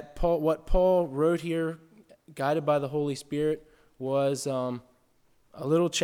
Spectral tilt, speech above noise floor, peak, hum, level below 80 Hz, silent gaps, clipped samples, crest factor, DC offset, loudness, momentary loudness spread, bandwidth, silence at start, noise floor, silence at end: -5.5 dB/octave; 38 dB; -12 dBFS; none; -40 dBFS; none; under 0.1%; 16 dB; under 0.1%; -28 LUFS; 12 LU; 16.5 kHz; 0 s; -65 dBFS; 0 s